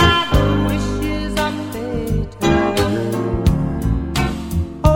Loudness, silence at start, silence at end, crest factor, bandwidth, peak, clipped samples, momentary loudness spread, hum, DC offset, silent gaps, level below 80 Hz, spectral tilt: -19 LUFS; 0 s; 0 s; 18 dB; 18.5 kHz; 0 dBFS; under 0.1%; 7 LU; none; under 0.1%; none; -24 dBFS; -6 dB/octave